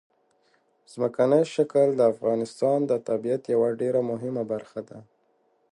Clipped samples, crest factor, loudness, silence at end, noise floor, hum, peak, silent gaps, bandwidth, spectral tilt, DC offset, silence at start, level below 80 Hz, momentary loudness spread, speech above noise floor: under 0.1%; 18 dB; -25 LUFS; 0.7 s; -68 dBFS; none; -8 dBFS; none; 11 kHz; -7 dB/octave; under 0.1%; 0.95 s; -74 dBFS; 11 LU; 43 dB